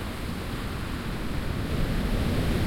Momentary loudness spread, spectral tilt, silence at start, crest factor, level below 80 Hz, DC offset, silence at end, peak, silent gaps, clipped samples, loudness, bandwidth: 6 LU; -6 dB/octave; 0 s; 14 dB; -32 dBFS; under 0.1%; 0 s; -14 dBFS; none; under 0.1%; -30 LUFS; 16.5 kHz